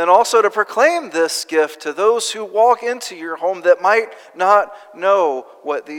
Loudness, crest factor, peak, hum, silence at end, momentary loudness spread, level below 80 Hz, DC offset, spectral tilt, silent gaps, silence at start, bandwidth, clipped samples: -16 LUFS; 16 dB; 0 dBFS; none; 0 s; 11 LU; -78 dBFS; under 0.1%; -1.5 dB/octave; none; 0 s; 17.5 kHz; under 0.1%